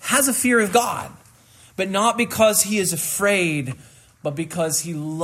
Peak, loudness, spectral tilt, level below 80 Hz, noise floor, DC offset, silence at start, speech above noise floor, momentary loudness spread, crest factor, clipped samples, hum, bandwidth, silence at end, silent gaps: -4 dBFS; -20 LUFS; -3 dB/octave; -62 dBFS; -50 dBFS; under 0.1%; 0 s; 30 dB; 14 LU; 18 dB; under 0.1%; none; 16 kHz; 0 s; none